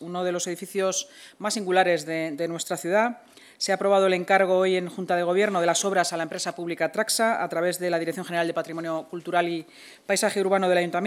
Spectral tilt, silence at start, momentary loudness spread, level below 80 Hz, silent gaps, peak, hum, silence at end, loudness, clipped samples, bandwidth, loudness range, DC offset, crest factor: -3.5 dB/octave; 0 s; 9 LU; -84 dBFS; none; -6 dBFS; none; 0 s; -25 LUFS; under 0.1%; 17 kHz; 4 LU; under 0.1%; 20 dB